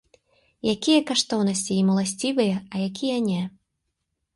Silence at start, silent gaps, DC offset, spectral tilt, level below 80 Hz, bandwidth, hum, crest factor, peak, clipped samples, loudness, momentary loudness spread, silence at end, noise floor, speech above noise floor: 0.65 s; none; under 0.1%; -4.5 dB/octave; -64 dBFS; 11.5 kHz; none; 18 dB; -8 dBFS; under 0.1%; -23 LUFS; 9 LU; 0.85 s; -78 dBFS; 55 dB